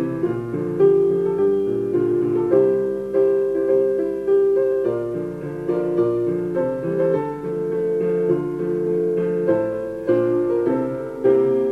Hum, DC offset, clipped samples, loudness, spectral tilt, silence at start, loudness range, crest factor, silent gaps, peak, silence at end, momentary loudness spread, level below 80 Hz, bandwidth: none; under 0.1%; under 0.1%; -20 LUFS; -9.5 dB/octave; 0 s; 3 LU; 14 dB; none; -4 dBFS; 0 s; 8 LU; -54 dBFS; 3.8 kHz